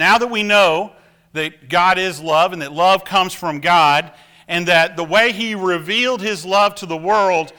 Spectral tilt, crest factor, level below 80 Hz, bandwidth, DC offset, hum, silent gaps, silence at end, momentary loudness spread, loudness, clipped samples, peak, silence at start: -3.5 dB/octave; 14 dB; -56 dBFS; over 20 kHz; under 0.1%; none; none; 0.1 s; 10 LU; -16 LUFS; under 0.1%; -2 dBFS; 0 s